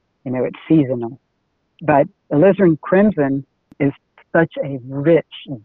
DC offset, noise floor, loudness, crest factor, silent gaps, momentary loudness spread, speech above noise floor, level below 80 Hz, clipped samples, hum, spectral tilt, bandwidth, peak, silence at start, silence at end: under 0.1%; -68 dBFS; -17 LUFS; 18 dB; none; 11 LU; 52 dB; -54 dBFS; under 0.1%; none; -11.5 dB/octave; 4 kHz; 0 dBFS; 0.25 s; 0.05 s